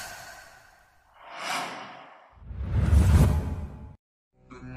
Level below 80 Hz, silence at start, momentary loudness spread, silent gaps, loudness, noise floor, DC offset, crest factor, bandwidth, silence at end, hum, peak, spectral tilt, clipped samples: -30 dBFS; 0 s; 25 LU; 3.99-4.31 s; -26 LUFS; -59 dBFS; under 0.1%; 18 dB; 15 kHz; 0 s; none; -8 dBFS; -6 dB/octave; under 0.1%